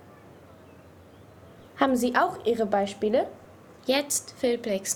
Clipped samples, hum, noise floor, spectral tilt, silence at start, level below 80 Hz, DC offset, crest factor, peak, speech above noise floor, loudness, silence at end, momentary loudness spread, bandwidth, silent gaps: under 0.1%; none; -51 dBFS; -3 dB/octave; 0.25 s; -64 dBFS; under 0.1%; 20 dB; -8 dBFS; 25 dB; -26 LUFS; 0 s; 6 LU; 19.5 kHz; none